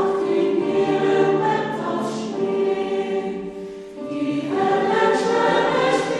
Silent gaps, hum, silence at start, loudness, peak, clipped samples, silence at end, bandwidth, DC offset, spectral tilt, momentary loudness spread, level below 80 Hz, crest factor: none; none; 0 s; -21 LUFS; -6 dBFS; under 0.1%; 0 s; 10.5 kHz; under 0.1%; -5.5 dB/octave; 11 LU; -60 dBFS; 14 dB